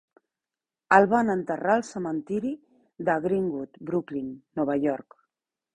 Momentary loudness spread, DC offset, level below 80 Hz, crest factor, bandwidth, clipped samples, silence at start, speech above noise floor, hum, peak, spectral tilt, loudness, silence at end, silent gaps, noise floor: 14 LU; under 0.1%; -66 dBFS; 24 dB; 11 kHz; under 0.1%; 0.9 s; over 65 dB; none; -2 dBFS; -7 dB/octave; -26 LUFS; 0.75 s; none; under -90 dBFS